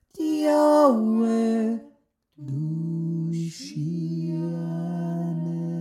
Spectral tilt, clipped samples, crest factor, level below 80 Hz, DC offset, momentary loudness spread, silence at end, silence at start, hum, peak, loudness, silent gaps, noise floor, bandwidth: -8 dB/octave; under 0.1%; 16 dB; -74 dBFS; under 0.1%; 13 LU; 0 s; 0.15 s; none; -8 dBFS; -25 LUFS; none; -61 dBFS; 16 kHz